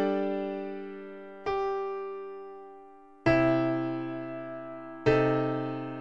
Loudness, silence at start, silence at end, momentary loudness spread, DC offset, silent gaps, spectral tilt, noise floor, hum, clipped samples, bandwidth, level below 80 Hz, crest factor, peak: -30 LUFS; 0 s; 0 s; 18 LU; 0.2%; none; -8 dB/octave; -52 dBFS; none; under 0.1%; 7.4 kHz; -56 dBFS; 20 dB; -10 dBFS